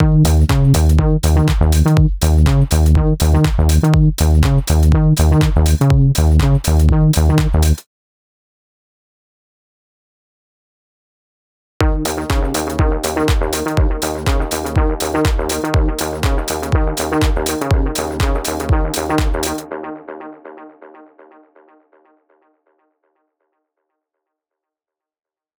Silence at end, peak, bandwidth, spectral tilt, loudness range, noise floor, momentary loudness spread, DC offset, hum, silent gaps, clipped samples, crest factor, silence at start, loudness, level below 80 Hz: 4.9 s; -4 dBFS; over 20 kHz; -6 dB/octave; 11 LU; -87 dBFS; 7 LU; under 0.1%; none; 7.86-11.80 s; under 0.1%; 12 dB; 0 s; -15 LUFS; -20 dBFS